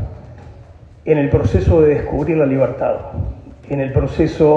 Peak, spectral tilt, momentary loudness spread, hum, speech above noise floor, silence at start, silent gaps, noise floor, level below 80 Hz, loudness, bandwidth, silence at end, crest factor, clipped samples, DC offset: 0 dBFS; -9.5 dB/octave; 16 LU; none; 25 dB; 0 s; none; -40 dBFS; -30 dBFS; -16 LUFS; 7.6 kHz; 0 s; 16 dB; under 0.1%; under 0.1%